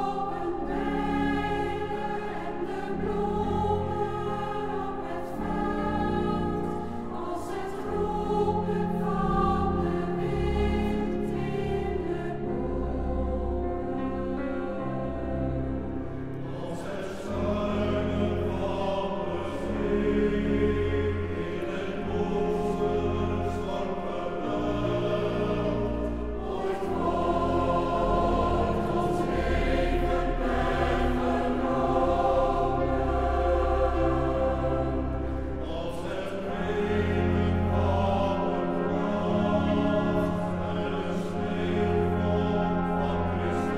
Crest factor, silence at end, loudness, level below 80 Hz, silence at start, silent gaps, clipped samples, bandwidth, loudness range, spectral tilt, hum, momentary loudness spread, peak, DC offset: 16 dB; 0 s; -28 LUFS; -36 dBFS; 0 s; none; under 0.1%; 12.5 kHz; 5 LU; -8 dB/octave; none; 7 LU; -12 dBFS; under 0.1%